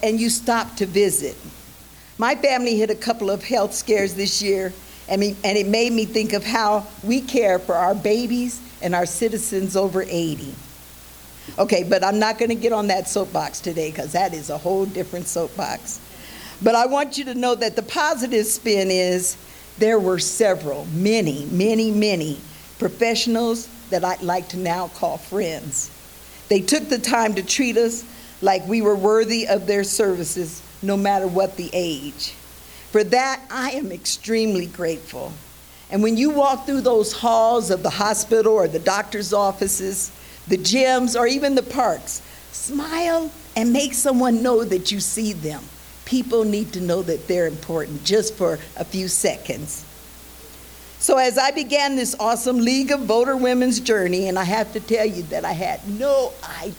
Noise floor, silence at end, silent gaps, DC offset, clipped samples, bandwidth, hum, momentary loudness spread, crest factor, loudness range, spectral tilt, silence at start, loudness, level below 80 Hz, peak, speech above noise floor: -44 dBFS; 0 s; none; under 0.1%; under 0.1%; over 20 kHz; none; 13 LU; 18 dB; 4 LU; -3.5 dB/octave; 0 s; -21 LUFS; -50 dBFS; -2 dBFS; 24 dB